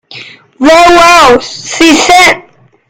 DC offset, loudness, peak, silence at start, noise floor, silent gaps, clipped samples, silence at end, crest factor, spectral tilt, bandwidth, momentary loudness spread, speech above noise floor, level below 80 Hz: under 0.1%; -4 LUFS; 0 dBFS; 0.15 s; -29 dBFS; none; 9%; 0.5 s; 6 dB; -2 dB/octave; over 20 kHz; 9 LU; 25 dB; -34 dBFS